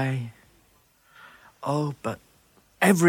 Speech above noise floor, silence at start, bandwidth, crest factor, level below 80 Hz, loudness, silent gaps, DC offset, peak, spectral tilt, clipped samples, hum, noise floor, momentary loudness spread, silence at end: 39 dB; 0 s; 17.5 kHz; 20 dB; -66 dBFS; -28 LUFS; none; under 0.1%; -6 dBFS; -5.5 dB/octave; under 0.1%; none; -62 dBFS; 26 LU; 0 s